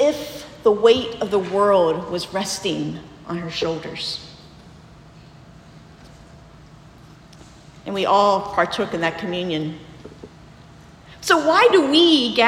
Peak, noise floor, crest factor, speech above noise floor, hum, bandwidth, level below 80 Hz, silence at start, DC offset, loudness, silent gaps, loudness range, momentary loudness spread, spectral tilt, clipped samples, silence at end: -2 dBFS; -45 dBFS; 20 dB; 26 dB; none; 16.5 kHz; -54 dBFS; 0 s; under 0.1%; -19 LUFS; none; 12 LU; 18 LU; -4 dB/octave; under 0.1%; 0 s